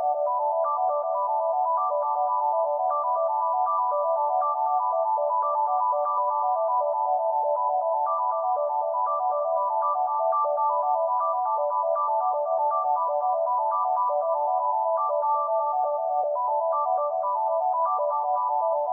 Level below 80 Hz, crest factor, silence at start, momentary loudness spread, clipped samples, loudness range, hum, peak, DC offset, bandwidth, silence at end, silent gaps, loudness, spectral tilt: under -90 dBFS; 10 dB; 0 s; 1 LU; under 0.1%; 1 LU; none; -14 dBFS; under 0.1%; 1.8 kHz; 0 s; none; -25 LUFS; -5.5 dB/octave